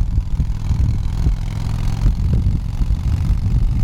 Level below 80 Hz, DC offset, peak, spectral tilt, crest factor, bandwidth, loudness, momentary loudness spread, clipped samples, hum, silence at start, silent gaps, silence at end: -18 dBFS; under 0.1%; -6 dBFS; -7.5 dB/octave; 12 dB; 10 kHz; -20 LUFS; 4 LU; under 0.1%; none; 0 s; none; 0 s